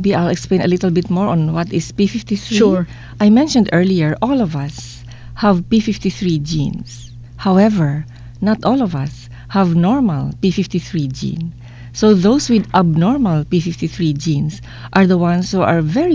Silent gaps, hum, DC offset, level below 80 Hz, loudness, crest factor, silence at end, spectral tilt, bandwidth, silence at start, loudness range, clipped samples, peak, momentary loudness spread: none; none; under 0.1%; -40 dBFS; -16 LUFS; 14 dB; 0 s; -7 dB/octave; 7.8 kHz; 0 s; 3 LU; under 0.1%; 0 dBFS; 14 LU